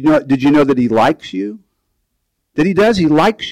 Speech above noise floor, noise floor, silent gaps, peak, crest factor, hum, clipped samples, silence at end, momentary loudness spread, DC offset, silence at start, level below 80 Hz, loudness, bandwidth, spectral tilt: 57 dB; -70 dBFS; none; -4 dBFS; 10 dB; none; under 0.1%; 0 s; 12 LU; under 0.1%; 0 s; -44 dBFS; -13 LUFS; 12 kHz; -6.5 dB/octave